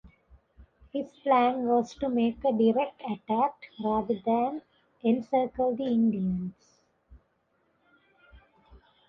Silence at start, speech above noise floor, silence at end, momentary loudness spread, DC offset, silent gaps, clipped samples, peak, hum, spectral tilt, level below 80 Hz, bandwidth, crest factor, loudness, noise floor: 0.05 s; 45 dB; 0.35 s; 11 LU; under 0.1%; none; under 0.1%; -12 dBFS; none; -8 dB/octave; -60 dBFS; 7 kHz; 18 dB; -28 LUFS; -72 dBFS